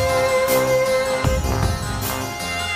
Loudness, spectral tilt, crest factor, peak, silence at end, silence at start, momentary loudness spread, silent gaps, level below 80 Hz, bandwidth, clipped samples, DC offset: -20 LUFS; -4 dB/octave; 14 dB; -6 dBFS; 0 s; 0 s; 7 LU; none; -30 dBFS; 15.5 kHz; under 0.1%; under 0.1%